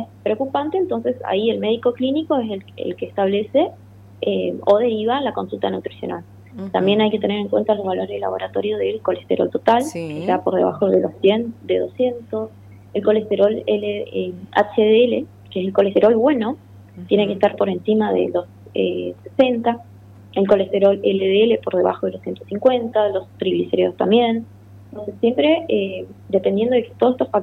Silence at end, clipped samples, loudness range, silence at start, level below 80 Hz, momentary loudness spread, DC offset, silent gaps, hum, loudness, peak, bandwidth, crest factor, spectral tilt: 0 s; under 0.1%; 3 LU; 0 s; -60 dBFS; 11 LU; under 0.1%; none; none; -19 LUFS; -4 dBFS; 12 kHz; 16 dB; -7 dB/octave